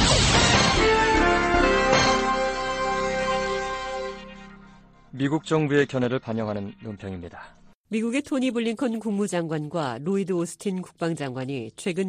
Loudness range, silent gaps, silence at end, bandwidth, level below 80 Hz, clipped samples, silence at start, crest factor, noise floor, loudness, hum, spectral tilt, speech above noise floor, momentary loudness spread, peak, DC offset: 8 LU; 7.75-7.84 s; 0 s; 13 kHz; -38 dBFS; under 0.1%; 0 s; 18 dB; -50 dBFS; -23 LUFS; none; -4 dB/octave; 24 dB; 15 LU; -6 dBFS; under 0.1%